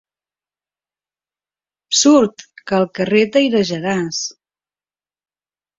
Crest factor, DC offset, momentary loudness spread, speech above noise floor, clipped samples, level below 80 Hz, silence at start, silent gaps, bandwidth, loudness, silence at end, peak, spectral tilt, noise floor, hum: 18 dB; under 0.1%; 11 LU; over 75 dB; under 0.1%; -60 dBFS; 1.9 s; none; 8 kHz; -16 LUFS; 1.45 s; -2 dBFS; -3.5 dB/octave; under -90 dBFS; none